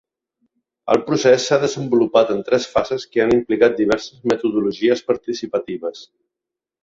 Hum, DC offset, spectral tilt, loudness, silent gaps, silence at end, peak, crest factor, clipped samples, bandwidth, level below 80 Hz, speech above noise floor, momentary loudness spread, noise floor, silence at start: none; under 0.1%; -5 dB/octave; -18 LUFS; none; 0.8 s; -2 dBFS; 18 dB; under 0.1%; 7.8 kHz; -54 dBFS; 68 dB; 9 LU; -86 dBFS; 0.85 s